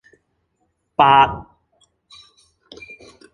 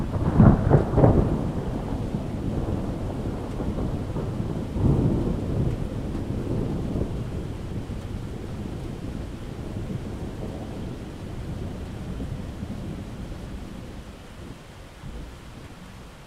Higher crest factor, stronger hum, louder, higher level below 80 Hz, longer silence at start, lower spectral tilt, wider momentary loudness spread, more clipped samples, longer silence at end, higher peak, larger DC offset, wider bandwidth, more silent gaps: second, 20 dB vs 26 dB; neither; first, -15 LUFS vs -27 LUFS; second, -50 dBFS vs -34 dBFS; first, 1 s vs 0 s; second, -5.5 dB/octave vs -8.5 dB/octave; first, 27 LU vs 20 LU; neither; first, 1.9 s vs 0 s; about the same, -2 dBFS vs 0 dBFS; neither; second, 10 kHz vs 13.5 kHz; neither